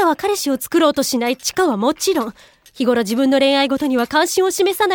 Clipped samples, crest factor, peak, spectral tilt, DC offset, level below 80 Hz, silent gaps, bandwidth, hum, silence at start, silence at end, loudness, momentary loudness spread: under 0.1%; 14 dB; -2 dBFS; -3 dB/octave; under 0.1%; -56 dBFS; none; over 20 kHz; none; 0 s; 0 s; -17 LUFS; 5 LU